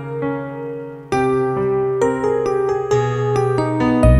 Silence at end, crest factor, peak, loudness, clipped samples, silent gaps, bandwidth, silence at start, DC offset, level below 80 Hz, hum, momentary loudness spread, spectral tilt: 0 s; 16 dB; -2 dBFS; -19 LUFS; under 0.1%; none; 12 kHz; 0 s; under 0.1%; -28 dBFS; none; 9 LU; -7.5 dB/octave